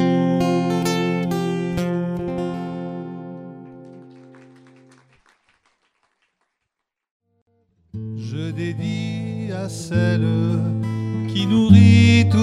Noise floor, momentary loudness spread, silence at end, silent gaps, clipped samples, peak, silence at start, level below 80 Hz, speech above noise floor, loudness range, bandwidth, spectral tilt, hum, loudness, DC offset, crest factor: -80 dBFS; 20 LU; 0 s; 7.11-7.20 s, 7.42-7.46 s; under 0.1%; 0 dBFS; 0 s; -50 dBFS; 64 dB; 21 LU; 12 kHz; -7 dB/octave; none; -19 LUFS; under 0.1%; 20 dB